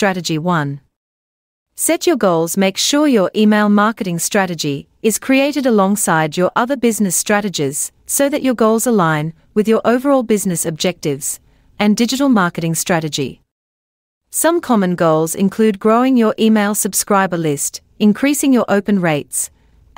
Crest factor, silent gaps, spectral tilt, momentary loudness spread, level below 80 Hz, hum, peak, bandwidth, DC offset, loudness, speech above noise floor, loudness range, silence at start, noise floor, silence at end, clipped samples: 14 dB; 0.96-1.66 s, 13.51-14.21 s; -4.5 dB/octave; 7 LU; -56 dBFS; none; -2 dBFS; 16.5 kHz; under 0.1%; -15 LUFS; over 75 dB; 3 LU; 0 s; under -90 dBFS; 0.5 s; under 0.1%